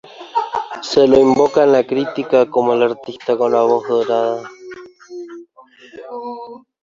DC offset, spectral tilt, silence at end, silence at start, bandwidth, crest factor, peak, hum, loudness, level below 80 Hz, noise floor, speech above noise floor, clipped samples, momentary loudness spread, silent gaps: under 0.1%; -5.5 dB/octave; 0.25 s; 0.2 s; 7.6 kHz; 16 dB; -2 dBFS; none; -15 LUFS; -54 dBFS; -45 dBFS; 31 dB; under 0.1%; 23 LU; none